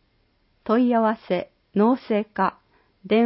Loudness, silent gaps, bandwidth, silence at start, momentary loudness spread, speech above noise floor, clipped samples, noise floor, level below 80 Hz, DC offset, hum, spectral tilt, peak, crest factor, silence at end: -23 LUFS; none; 5.8 kHz; 0.65 s; 8 LU; 44 dB; under 0.1%; -65 dBFS; -66 dBFS; under 0.1%; none; -11 dB/octave; -8 dBFS; 14 dB; 0 s